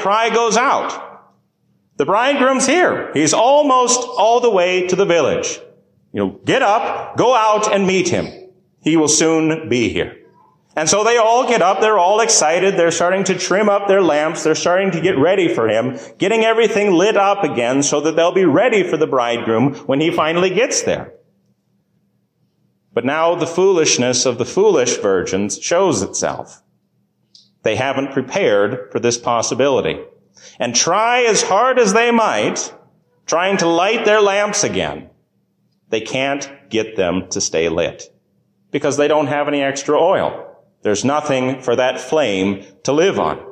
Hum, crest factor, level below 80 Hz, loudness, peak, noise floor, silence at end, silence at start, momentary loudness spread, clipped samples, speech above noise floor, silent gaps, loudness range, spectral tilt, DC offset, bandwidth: none; 12 dB; -52 dBFS; -15 LUFS; -4 dBFS; -63 dBFS; 0 s; 0 s; 9 LU; under 0.1%; 48 dB; none; 6 LU; -3.5 dB/octave; under 0.1%; 12 kHz